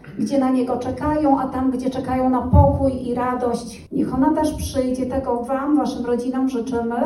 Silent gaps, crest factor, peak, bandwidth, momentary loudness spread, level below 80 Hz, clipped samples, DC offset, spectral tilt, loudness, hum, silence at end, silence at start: none; 20 dB; 0 dBFS; 12.5 kHz; 6 LU; -34 dBFS; under 0.1%; under 0.1%; -7.5 dB/octave; -20 LUFS; none; 0 s; 0.05 s